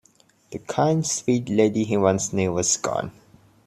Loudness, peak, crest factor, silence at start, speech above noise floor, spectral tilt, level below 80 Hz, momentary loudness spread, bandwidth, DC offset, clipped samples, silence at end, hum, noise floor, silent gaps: -22 LUFS; -4 dBFS; 20 dB; 0.5 s; 37 dB; -4.5 dB/octave; -58 dBFS; 10 LU; 14.5 kHz; under 0.1%; under 0.1%; 0.55 s; none; -59 dBFS; none